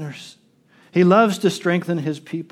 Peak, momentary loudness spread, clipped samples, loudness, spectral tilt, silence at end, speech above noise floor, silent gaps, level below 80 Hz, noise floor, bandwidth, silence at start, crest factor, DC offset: -2 dBFS; 16 LU; under 0.1%; -19 LUFS; -6.5 dB/octave; 0.1 s; 36 dB; none; -74 dBFS; -55 dBFS; 14 kHz; 0 s; 18 dB; under 0.1%